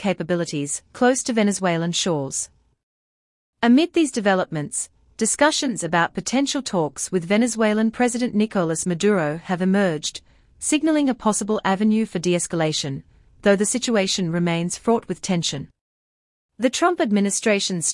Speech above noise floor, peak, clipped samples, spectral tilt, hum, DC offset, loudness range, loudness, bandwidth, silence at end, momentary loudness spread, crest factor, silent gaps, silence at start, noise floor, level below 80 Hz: over 69 dB; -4 dBFS; under 0.1%; -4 dB/octave; none; under 0.1%; 2 LU; -21 LUFS; 12 kHz; 0 s; 7 LU; 18 dB; 2.83-3.53 s, 15.81-16.49 s; 0 s; under -90 dBFS; -58 dBFS